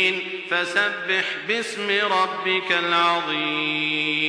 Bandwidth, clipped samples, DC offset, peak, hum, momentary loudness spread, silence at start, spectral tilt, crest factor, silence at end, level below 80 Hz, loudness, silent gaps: 10.5 kHz; under 0.1%; under 0.1%; -6 dBFS; none; 5 LU; 0 s; -3 dB/octave; 18 dB; 0 s; -74 dBFS; -21 LUFS; none